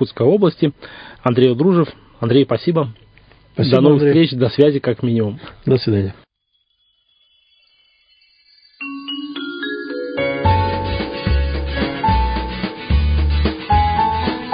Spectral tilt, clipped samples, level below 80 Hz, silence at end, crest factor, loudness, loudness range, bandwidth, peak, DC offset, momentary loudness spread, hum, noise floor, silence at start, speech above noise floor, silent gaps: -10 dB/octave; under 0.1%; -26 dBFS; 0 s; 18 dB; -17 LUFS; 13 LU; 5.2 kHz; 0 dBFS; under 0.1%; 12 LU; none; -67 dBFS; 0 s; 52 dB; none